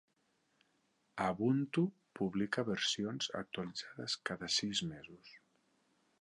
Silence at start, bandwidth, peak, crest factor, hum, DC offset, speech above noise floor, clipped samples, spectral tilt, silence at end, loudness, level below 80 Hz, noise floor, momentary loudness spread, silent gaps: 1.15 s; 11 kHz; -20 dBFS; 20 dB; none; under 0.1%; 41 dB; under 0.1%; -4 dB/octave; 0.85 s; -37 LUFS; -72 dBFS; -78 dBFS; 11 LU; none